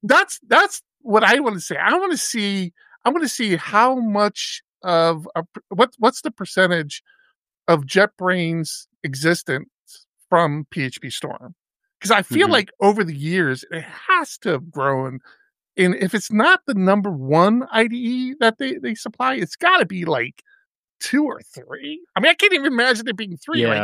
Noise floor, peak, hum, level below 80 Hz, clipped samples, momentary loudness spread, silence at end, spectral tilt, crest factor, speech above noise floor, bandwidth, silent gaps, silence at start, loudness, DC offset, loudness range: -64 dBFS; 0 dBFS; none; -72 dBFS; under 0.1%; 14 LU; 0 s; -4.5 dB/octave; 20 dB; 44 dB; 15.5 kHz; 4.64-4.73 s, 7.36-7.45 s, 8.96-9.01 s, 9.79-9.86 s, 20.66-20.83 s, 20.91-20.99 s; 0.05 s; -19 LUFS; under 0.1%; 3 LU